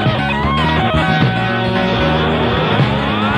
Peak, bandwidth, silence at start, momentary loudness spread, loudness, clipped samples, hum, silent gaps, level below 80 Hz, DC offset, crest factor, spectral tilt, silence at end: 0 dBFS; 10.5 kHz; 0 s; 2 LU; -15 LUFS; under 0.1%; none; none; -28 dBFS; under 0.1%; 14 dB; -7 dB/octave; 0 s